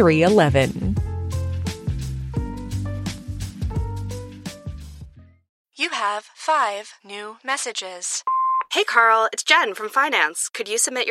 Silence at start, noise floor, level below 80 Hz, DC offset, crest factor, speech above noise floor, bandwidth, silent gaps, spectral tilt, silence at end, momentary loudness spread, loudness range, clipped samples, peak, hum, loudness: 0 s; -43 dBFS; -38 dBFS; under 0.1%; 22 dB; 24 dB; 15.5 kHz; 5.49-5.65 s; -4 dB/octave; 0 s; 17 LU; 11 LU; under 0.1%; 0 dBFS; none; -21 LUFS